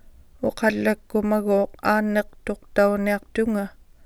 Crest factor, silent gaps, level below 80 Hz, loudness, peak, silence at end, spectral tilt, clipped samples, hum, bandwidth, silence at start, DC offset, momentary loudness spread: 18 dB; none; -48 dBFS; -23 LUFS; -6 dBFS; 0.35 s; -6.5 dB/octave; under 0.1%; none; 14.5 kHz; 0.4 s; under 0.1%; 8 LU